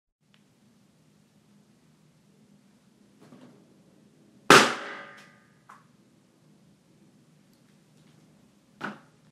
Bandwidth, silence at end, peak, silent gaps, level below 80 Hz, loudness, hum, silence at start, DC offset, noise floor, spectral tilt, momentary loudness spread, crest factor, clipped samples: 15 kHz; 0.4 s; 0 dBFS; none; -74 dBFS; -21 LUFS; none; 4.5 s; under 0.1%; -63 dBFS; -2.5 dB/octave; 25 LU; 30 dB; under 0.1%